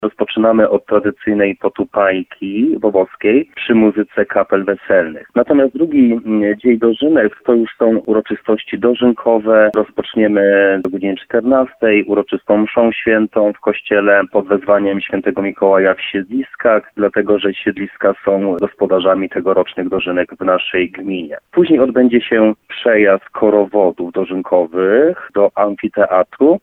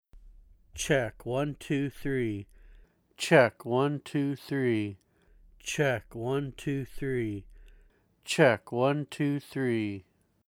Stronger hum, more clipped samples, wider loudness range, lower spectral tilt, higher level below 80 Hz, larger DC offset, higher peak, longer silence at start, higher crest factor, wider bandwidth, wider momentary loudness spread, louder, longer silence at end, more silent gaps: neither; neither; second, 2 LU vs 5 LU; first, -8.5 dB/octave vs -5.5 dB/octave; about the same, -54 dBFS vs -56 dBFS; neither; first, 0 dBFS vs -8 dBFS; second, 0 s vs 0.15 s; second, 14 dB vs 24 dB; second, 4 kHz vs 17.5 kHz; second, 7 LU vs 12 LU; first, -14 LUFS vs -29 LUFS; second, 0.05 s vs 0.5 s; neither